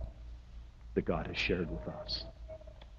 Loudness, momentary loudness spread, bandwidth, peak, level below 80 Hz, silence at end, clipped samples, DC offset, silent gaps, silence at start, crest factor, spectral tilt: -37 LUFS; 19 LU; 7.6 kHz; -16 dBFS; -48 dBFS; 0 s; under 0.1%; under 0.1%; none; 0 s; 22 dB; -6 dB/octave